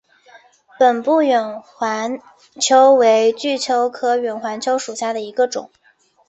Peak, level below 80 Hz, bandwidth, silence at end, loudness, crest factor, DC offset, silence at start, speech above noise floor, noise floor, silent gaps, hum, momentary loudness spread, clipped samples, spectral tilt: -2 dBFS; -70 dBFS; 8.2 kHz; 0.6 s; -17 LUFS; 16 dB; under 0.1%; 0.35 s; 32 dB; -49 dBFS; none; none; 12 LU; under 0.1%; -2 dB/octave